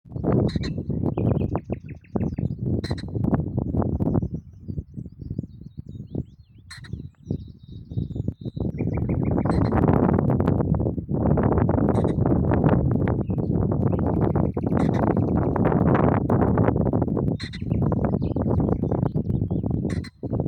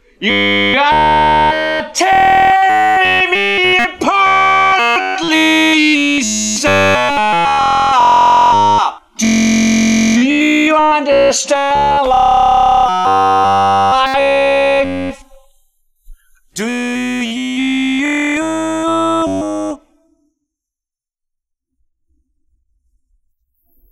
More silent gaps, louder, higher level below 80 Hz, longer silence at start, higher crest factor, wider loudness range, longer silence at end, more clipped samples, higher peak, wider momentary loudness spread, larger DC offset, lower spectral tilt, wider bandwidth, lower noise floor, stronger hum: neither; second, -24 LUFS vs -11 LUFS; about the same, -36 dBFS vs -40 dBFS; second, 0.05 s vs 0.2 s; first, 18 dB vs 12 dB; about the same, 11 LU vs 9 LU; second, 0 s vs 4.15 s; neither; second, -6 dBFS vs 0 dBFS; first, 14 LU vs 9 LU; neither; first, -10 dB/octave vs -3 dB/octave; second, 9 kHz vs 14 kHz; second, -47 dBFS vs -86 dBFS; neither